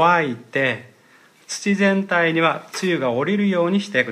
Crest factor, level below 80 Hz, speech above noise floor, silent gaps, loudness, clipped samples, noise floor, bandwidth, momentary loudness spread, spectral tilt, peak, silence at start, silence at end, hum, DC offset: 16 dB; -72 dBFS; 33 dB; none; -20 LUFS; under 0.1%; -52 dBFS; 13.5 kHz; 7 LU; -5 dB/octave; -4 dBFS; 0 s; 0 s; none; under 0.1%